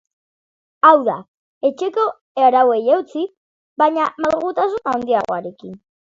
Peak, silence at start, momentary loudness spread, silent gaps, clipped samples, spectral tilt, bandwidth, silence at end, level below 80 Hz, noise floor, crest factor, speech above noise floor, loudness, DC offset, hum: 0 dBFS; 0.85 s; 16 LU; 1.28-1.61 s, 2.21-2.35 s, 3.37-3.76 s; under 0.1%; -5.5 dB/octave; 7.6 kHz; 0.25 s; -62 dBFS; under -90 dBFS; 18 dB; over 73 dB; -17 LUFS; under 0.1%; none